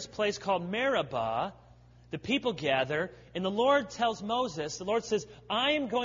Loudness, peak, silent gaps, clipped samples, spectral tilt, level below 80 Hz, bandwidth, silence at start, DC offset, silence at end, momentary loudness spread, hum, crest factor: -30 LUFS; -14 dBFS; none; under 0.1%; -4 dB/octave; -62 dBFS; 7.6 kHz; 0 s; under 0.1%; 0 s; 8 LU; 60 Hz at -55 dBFS; 18 dB